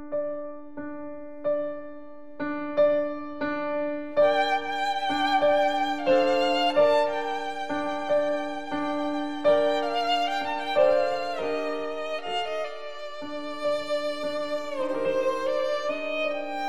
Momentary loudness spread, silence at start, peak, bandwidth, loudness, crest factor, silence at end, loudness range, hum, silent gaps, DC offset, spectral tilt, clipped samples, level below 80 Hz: 13 LU; 0 s; -10 dBFS; 11.5 kHz; -26 LUFS; 16 dB; 0 s; 6 LU; none; none; 1%; -4 dB/octave; under 0.1%; -64 dBFS